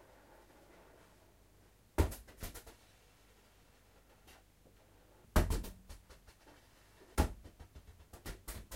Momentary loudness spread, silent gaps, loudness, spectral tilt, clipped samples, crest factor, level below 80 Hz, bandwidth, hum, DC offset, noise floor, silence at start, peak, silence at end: 26 LU; none; -40 LUFS; -5.5 dB/octave; under 0.1%; 28 dB; -46 dBFS; 16 kHz; none; under 0.1%; -66 dBFS; 2 s; -16 dBFS; 0 s